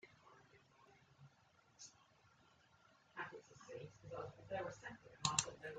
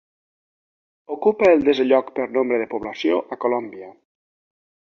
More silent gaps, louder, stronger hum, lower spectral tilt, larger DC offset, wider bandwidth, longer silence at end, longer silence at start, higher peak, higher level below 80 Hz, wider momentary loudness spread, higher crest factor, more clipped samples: neither; second, -46 LUFS vs -20 LUFS; neither; second, -2 dB/octave vs -6 dB/octave; neither; first, 9 kHz vs 6.8 kHz; second, 0 s vs 1.05 s; second, 0.05 s vs 1.1 s; second, -18 dBFS vs -4 dBFS; second, -78 dBFS vs -62 dBFS; first, 28 LU vs 13 LU; first, 34 dB vs 18 dB; neither